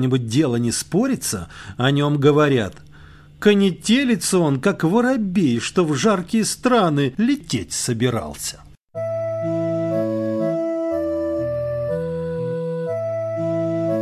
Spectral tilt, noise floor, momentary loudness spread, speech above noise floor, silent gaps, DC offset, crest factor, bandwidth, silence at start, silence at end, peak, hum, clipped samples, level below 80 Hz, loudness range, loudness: -5.5 dB/octave; -44 dBFS; 8 LU; 26 dB; 8.81-8.88 s; under 0.1%; 18 dB; 15 kHz; 0 s; 0 s; -2 dBFS; none; under 0.1%; -48 dBFS; 5 LU; -20 LUFS